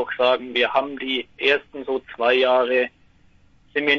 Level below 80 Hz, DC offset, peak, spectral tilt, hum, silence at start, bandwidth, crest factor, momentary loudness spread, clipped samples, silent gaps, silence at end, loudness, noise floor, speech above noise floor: -62 dBFS; under 0.1%; -4 dBFS; -4.5 dB/octave; none; 0 s; 7 kHz; 18 dB; 10 LU; under 0.1%; none; 0 s; -21 LUFS; -55 dBFS; 33 dB